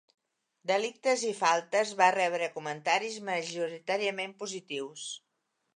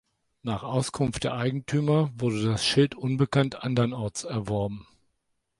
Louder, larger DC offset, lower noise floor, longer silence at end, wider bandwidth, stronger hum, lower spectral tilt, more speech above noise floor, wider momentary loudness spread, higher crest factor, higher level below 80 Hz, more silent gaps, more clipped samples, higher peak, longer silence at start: second, -30 LUFS vs -27 LUFS; neither; first, -80 dBFS vs -76 dBFS; second, 0.55 s vs 0.8 s; about the same, 11 kHz vs 11.5 kHz; neither; second, -2.5 dB/octave vs -6 dB/octave; about the same, 50 dB vs 50 dB; first, 14 LU vs 9 LU; about the same, 22 dB vs 18 dB; second, -88 dBFS vs -54 dBFS; neither; neither; about the same, -10 dBFS vs -8 dBFS; first, 0.65 s vs 0.45 s